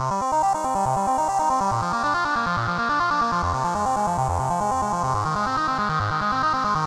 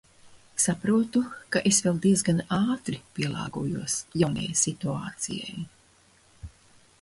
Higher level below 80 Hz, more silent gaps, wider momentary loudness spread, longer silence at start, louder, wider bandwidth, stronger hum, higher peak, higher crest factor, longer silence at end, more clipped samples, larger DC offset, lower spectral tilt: first, -44 dBFS vs -56 dBFS; neither; second, 2 LU vs 11 LU; second, 0 s vs 0.25 s; first, -22 LUFS vs -26 LUFS; first, 15 kHz vs 12 kHz; neither; about the same, -10 dBFS vs -10 dBFS; second, 12 dB vs 18 dB; second, 0 s vs 0.55 s; neither; first, 0.2% vs under 0.1%; about the same, -5 dB/octave vs -4 dB/octave